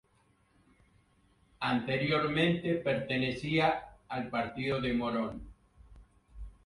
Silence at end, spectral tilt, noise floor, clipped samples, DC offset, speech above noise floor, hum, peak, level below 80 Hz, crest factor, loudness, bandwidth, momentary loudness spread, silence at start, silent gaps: 0.15 s; -7 dB/octave; -69 dBFS; under 0.1%; under 0.1%; 38 dB; none; -16 dBFS; -56 dBFS; 18 dB; -32 LUFS; 11.5 kHz; 11 LU; 1.6 s; none